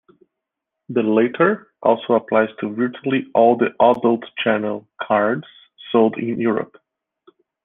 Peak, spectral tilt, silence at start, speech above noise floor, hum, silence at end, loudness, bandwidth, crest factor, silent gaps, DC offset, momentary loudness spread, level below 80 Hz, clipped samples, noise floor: -2 dBFS; -9 dB/octave; 0.9 s; 64 dB; none; 1 s; -19 LUFS; 3.9 kHz; 18 dB; none; under 0.1%; 8 LU; -64 dBFS; under 0.1%; -82 dBFS